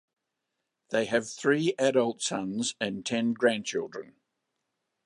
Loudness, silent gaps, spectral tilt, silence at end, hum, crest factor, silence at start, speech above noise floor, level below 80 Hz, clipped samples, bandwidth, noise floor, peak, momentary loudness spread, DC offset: -28 LUFS; none; -4 dB/octave; 1 s; none; 20 dB; 0.9 s; 55 dB; -72 dBFS; under 0.1%; 11 kHz; -83 dBFS; -10 dBFS; 8 LU; under 0.1%